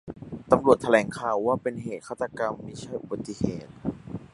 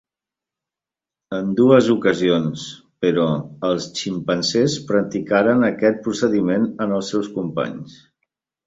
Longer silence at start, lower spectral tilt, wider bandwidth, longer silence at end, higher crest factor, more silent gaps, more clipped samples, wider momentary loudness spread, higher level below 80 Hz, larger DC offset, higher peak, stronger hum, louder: second, 0.05 s vs 1.3 s; about the same, -6.5 dB/octave vs -5.5 dB/octave; first, 11.5 kHz vs 8 kHz; second, 0.05 s vs 0.75 s; about the same, 24 dB vs 20 dB; neither; neither; first, 16 LU vs 11 LU; about the same, -54 dBFS vs -58 dBFS; neither; about the same, -2 dBFS vs 0 dBFS; neither; second, -27 LUFS vs -19 LUFS